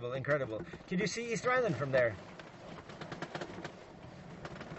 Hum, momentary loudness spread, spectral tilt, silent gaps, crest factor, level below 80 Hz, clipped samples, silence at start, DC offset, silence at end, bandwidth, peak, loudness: none; 19 LU; -5 dB/octave; none; 18 dB; -64 dBFS; under 0.1%; 0 s; under 0.1%; 0 s; 8.2 kHz; -18 dBFS; -35 LUFS